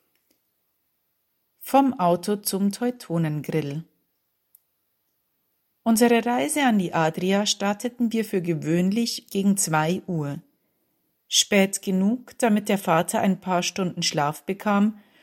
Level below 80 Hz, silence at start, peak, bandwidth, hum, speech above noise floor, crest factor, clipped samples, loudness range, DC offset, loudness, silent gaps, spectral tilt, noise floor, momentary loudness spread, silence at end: -70 dBFS; 1.6 s; -4 dBFS; 16.5 kHz; none; 51 dB; 20 dB; under 0.1%; 5 LU; under 0.1%; -23 LUFS; none; -4.5 dB/octave; -74 dBFS; 8 LU; 0.25 s